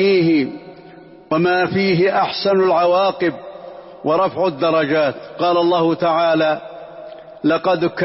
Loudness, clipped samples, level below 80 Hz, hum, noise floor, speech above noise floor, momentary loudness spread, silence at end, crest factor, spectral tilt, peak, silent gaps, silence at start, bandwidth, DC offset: -17 LUFS; under 0.1%; -58 dBFS; none; -41 dBFS; 25 dB; 20 LU; 0 s; 10 dB; -9.5 dB/octave; -6 dBFS; none; 0 s; 5.8 kHz; under 0.1%